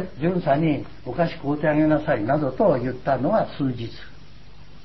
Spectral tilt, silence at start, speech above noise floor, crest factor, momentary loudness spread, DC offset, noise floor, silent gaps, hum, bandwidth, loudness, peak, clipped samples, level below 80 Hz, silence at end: -9.5 dB/octave; 0 s; 24 dB; 16 dB; 9 LU; 1%; -47 dBFS; none; none; 6 kHz; -23 LUFS; -8 dBFS; under 0.1%; -48 dBFS; 0.2 s